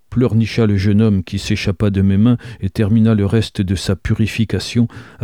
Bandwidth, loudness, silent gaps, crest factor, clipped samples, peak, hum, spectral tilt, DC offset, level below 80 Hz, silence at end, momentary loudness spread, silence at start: 12.5 kHz; -16 LUFS; none; 12 dB; under 0.1%; -2 dBFS; none; -7 dB/octave; 0.3%; -36 dBFS; 0.2 s; 6 LU; 0.1 s